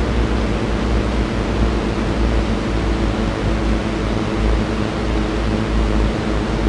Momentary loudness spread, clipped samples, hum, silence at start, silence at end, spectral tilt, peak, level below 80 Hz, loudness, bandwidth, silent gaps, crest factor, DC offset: 1 LU; under 0.1%; none; 0 s; 0 s; -6.5 dB/octave; -4 dBFS; -22 dBFS; -20 LUFS; 10.5 kHz; none; 14 dB; under 0.1%